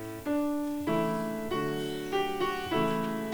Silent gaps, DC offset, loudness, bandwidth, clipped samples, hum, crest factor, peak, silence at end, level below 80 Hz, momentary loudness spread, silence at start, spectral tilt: none; under 0.1%; -31 LUFS; over 20 kHz; under 0.1%; none; 14 dB; -16 dBFS; 0 s; -56 dBFS; 4 LU; 0 s; -5.5 dB/octave